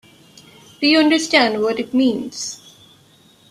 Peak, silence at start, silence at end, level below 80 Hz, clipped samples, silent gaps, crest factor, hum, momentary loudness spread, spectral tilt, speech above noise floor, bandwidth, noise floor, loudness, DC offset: -2 dBFS; 0.8 s; 0.95 s; -62 dBFS; under 0.1%; none; 18 dB; none; 14 LU; -2.5 dB/octave; 35 dB; 13.5 kHz; -51 dBFS; -17 LUFS; under 0.1%